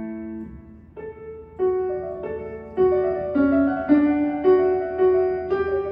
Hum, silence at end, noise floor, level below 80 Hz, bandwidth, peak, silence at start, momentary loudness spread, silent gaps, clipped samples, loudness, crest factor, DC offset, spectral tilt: none; 0 s; -42 dBFS; -48 dBFS; 5.2 kHz; -6 dBFS; 0 s; 18 LU; none; under 0.1%; -21 LUFS; 16 dB; under 0.1%; -10.5 dB/octave